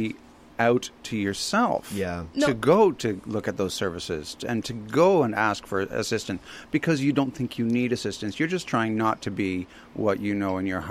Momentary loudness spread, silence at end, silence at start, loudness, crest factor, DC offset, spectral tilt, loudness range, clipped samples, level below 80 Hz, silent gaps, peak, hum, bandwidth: 11 LU; 0 s; 0 s; -26 LUFS; 18 dB; under 0.1%; -5.5 dB/octave; 3 LU; under 0.1%; -56 dBFS; none; -8 dBFS; none; 15.5 kHz